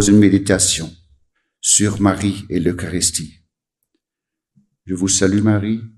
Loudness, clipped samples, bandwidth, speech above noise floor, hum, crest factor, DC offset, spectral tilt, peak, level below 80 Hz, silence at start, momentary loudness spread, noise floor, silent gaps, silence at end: -16 LUFS; under 0.1%; 14 kHz; 68 dB; none; 18 dB; under 0.1%; -4 dB/octave; 0 dBFS; -44 dBFS; 0 s; 10 LU; -84 dBFS; none; 0.1 s